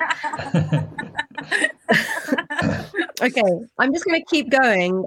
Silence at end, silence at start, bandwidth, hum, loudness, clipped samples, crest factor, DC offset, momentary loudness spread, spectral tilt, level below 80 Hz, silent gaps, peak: 0 s; 0 s; 17 kHz; none; -21 LUFS; under 0.1%; 18 dB; under 0.1%; 9 LU; -5 dB/octave; -56 dBFS; none; -2 dBFS